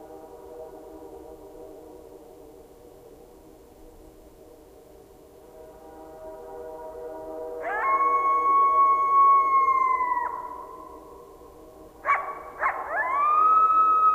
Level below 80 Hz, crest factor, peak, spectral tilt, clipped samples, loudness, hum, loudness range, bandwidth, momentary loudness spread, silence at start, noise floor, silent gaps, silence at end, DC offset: -58 dBFS; 14 dB; -12 dBFS; -4.5 dB/octave; under 0.1%; -21 LUFS; none; 24 LU; 15.5 kHz; 26 LU; 0 s; -50 dBFS; none; 0 s; under 0.1%